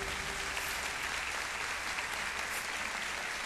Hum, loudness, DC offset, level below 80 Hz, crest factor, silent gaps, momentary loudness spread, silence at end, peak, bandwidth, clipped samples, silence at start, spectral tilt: none; -35 LUFS; under 0.1%; -54 dBFS; 16 dB; none; 1 LU; 0 s; -22 dBFS; 14 kHz; under 0.1%; 0 s; -0.5 dB/octave